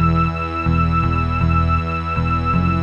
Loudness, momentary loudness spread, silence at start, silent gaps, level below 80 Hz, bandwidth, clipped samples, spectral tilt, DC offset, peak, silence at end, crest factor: -18 LUFS; 3 LU; 0 s; none; -26 dBFS; 7 kHz; under 0.1%; -9 dB/octave; under 0.1%; -6 dBFS; 0 s; 12 dB